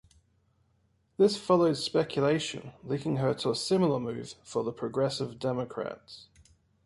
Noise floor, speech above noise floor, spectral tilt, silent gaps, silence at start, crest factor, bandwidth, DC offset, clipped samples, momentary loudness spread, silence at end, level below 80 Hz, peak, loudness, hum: -70 dBFS; 41 dB; -5.5 dB/octave; none; 1.2 s; 20 dB; 11.5 kHz; under 0.1%; under 0.1%; 15 LU; 0.65 s; -66 dBFS; -10 dBFS; -29 LUFS; none